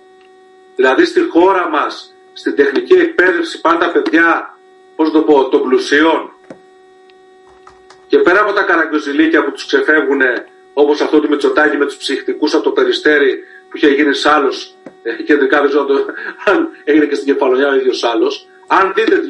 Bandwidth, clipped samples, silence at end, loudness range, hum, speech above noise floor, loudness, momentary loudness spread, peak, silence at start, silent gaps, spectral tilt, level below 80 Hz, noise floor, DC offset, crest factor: 11 kHz; under 0.1%; 0 s; 3 LU; none; 31 dB; -13 LUFS; 11 LU; 0 dBFS; 0.8 s; none; -3.5 dB/octave; -58 dBFS; -43 dBFS; under 0.1%; 14 dB